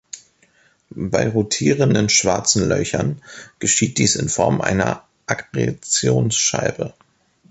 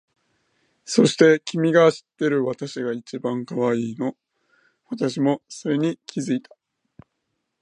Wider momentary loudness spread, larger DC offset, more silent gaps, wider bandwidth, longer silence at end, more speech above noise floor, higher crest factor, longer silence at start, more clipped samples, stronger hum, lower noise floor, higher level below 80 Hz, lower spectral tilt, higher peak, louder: about the same, 14 LU vs 12 LU; neither; neither; second, 8.8 kHz vs 11 kHz; second, 0.6 s vs 1.2 s; second, 39 dB vs 56 dB; about the same, 18 dB vs 22 dB; second, 0.15 s vs 0.85 s; neither; neither; second, -57 dBFS vs -77 dBFS; first, -46 dBFS vs -72 dBFS; second, -3.5 dB/octave vs -5.5 dB/octave; about the same, -2 dBFS vs -2 dBFS; first, -18 LUFS vs -22 LUFS